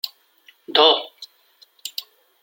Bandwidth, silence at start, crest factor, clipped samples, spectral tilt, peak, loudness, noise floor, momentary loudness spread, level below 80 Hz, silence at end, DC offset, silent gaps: 16.5 kHz; 0.05 s; 22 dB; under 0.1%; -0.5 dB/octave; 0 dBFS; -18 LUFS; -56 dBFS; 21 LU; -80 dBFS; 0.4 s; under 0.1%; none